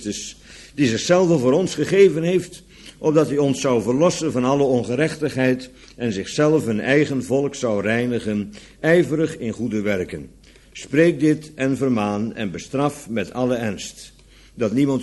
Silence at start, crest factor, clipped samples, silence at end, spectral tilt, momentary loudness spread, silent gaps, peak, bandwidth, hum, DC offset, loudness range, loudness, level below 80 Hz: 0 s; 18 dB; under 0.1%; 0 s; -6 dB/octave; 14 LU; none; -2 dBFS; 12 kHz; none; under 0.1%; 4 LU; -20 LUFS; -52 dBFS